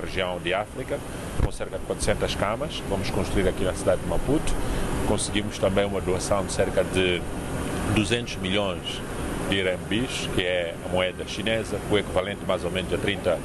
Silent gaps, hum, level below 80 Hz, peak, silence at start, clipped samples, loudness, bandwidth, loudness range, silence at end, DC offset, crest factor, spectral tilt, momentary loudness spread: none; none; -36 dBFS; -8 dBFS; 0 s; under 0.1%; -26 LUFS; 13 kHz; 2 LU; 0 s; under 0.1%; 18 dB; -4.5 dB/octave; 6 LU